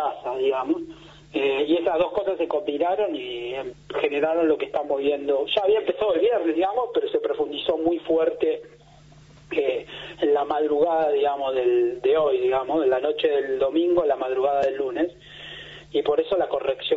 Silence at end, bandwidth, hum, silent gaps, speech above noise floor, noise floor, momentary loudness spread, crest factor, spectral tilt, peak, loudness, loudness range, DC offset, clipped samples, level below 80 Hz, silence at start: 0 s; 7.6 kHz; none; none; 27 dB; -50 dBFS; 9 LU; 16 dB; -2.5 dB/octave; -8 dBFS; -23 LUFS; 3 LU; under 0.1%; under 0.1%; -58 dBFS; 0 s